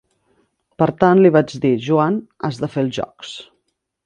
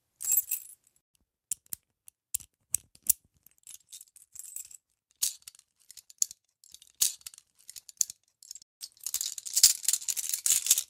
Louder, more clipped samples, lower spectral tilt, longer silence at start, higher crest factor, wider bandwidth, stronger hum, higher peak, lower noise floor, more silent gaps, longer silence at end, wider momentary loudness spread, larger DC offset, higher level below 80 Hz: first, -17 LUFS vs -28 LUFS; neither; first, -7.5 dB/octave vs 3.5 dB/octave; first, 0.8 s vs 0.2 s; second, 18 dB vs 30 dB; second, 9.2 kHz vs 16.5 kHz; neither; about the same, 0 dBFS vs -2 dBFS; first, -71 dBFS vs -65 dBFS; second, none vs 1.01-1.14 s, 8.62-8.80 s; first, 0.65 s vs 0.05 s; second, 18 LU vs 24 LU; neither; first, -56 dBFS vs -74 dBFS